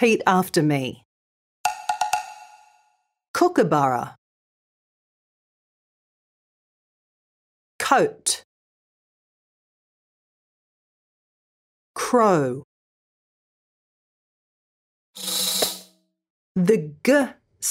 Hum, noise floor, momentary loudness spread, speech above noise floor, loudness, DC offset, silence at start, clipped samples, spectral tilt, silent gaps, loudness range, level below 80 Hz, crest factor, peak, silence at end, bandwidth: none; -67 dBFS; 12 LU; 47 dB; -22 LUFS; under 0.1%; 0 s; under 0.1%; -4 dB/octave; 1.05-1.64 s, 3.28-3.34 s, 4.18-7.79 s, 8.45-11.94 s, 12.64-15.14 s, 16.30-16.55 s; 6 LU; -70 dBFS; 24 dB; -2 dBFS; 0 s; 16 kHz